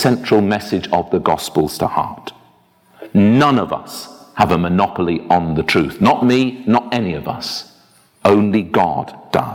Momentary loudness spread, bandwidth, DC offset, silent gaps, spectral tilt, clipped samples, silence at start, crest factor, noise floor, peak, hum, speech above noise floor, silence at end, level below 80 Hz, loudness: 12 LU; 17.5 kHz; under 0.1%; none; -6 dB/octave; under 0.1%; 0 s; 16 dB; -53 dBFS; 0 dBFS; none; 37 dB; 0 s; -46 dBFS; -16 LUFS